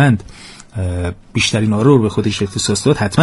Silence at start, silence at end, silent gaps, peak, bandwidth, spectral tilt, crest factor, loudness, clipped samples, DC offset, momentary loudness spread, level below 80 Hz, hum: 0 s; 0 s; none; 0 dBFS; 11.5 kHz; -5.5 dB/octave; 14 dB; -16 LUFS; under 0.1%; under 0.1%; 13 LU; -38 dBFS; none